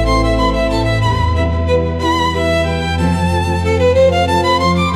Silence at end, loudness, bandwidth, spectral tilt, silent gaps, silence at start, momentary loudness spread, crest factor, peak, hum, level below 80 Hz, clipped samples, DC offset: 0 s; -14 LUFS; 13 kHz; -6 dB/octave; none; 0 s; 4 LU; 12 dB; -2 dBFS; none; -24 dBFS; under 0.1%; under 0.1%